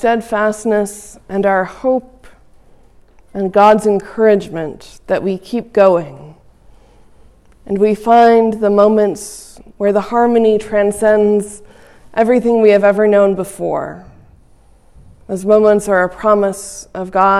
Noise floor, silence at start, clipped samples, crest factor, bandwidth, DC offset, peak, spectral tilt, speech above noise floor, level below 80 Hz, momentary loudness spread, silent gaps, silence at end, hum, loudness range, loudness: -46 dBFS; 0 s; under 0.1%; 14 dB; 13 kHz; under 0.1%; 0 dBFS; -6 dB/octave; 33 dB; -46 dBFS; 16 LU; none; 0 s; none; 5 LU; -13 LUFS